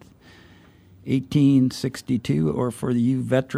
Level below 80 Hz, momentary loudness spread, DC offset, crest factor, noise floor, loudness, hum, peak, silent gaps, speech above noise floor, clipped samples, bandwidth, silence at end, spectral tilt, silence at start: -54 dBFS; 8 LU; under 0.1%; 16 dB; -51 dBFS; -22 LUFS; none; -6 dBFS; none; 30 dB; under 0.1%; 14 kHz; 0 s; -7.5 dB/octave; 1.05 s